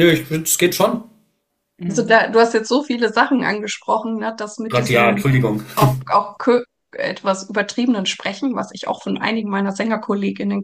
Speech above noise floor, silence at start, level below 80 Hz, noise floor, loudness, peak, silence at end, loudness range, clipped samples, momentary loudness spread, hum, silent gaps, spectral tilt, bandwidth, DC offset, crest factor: 53 dB; 0 s; -52 dBFS; -70 dBFS; -18 LUFS; 0 dBFS; 0 s; 4 LU; under 0.1%; 10 LU; none; none; -4.5 dB/octave; 15.5 kHz; under 0.1%; 18 dB